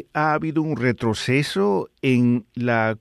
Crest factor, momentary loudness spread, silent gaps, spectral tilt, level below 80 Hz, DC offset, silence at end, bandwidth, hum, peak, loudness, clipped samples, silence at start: 14 dB; 4 LU; none; -6.5 dB/octave; -58 dBFS; under 0.1%; 0.05 s; 12.5 kHz; none; -6 dBFS; -21 LUFS; under 0.1%; 0.15 s